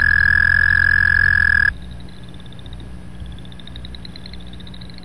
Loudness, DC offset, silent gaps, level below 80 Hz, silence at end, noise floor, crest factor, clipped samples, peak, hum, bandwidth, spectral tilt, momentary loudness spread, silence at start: -13 LUFS; 2%; none; -32 dBFS; 0.05 s; -36 dBFS; 14 dB; under 0.1%; -4 dBFS; 60 Hz at -40 dBFS; 12 kHz; -4.5 dB/octave; 24 LU; 0 s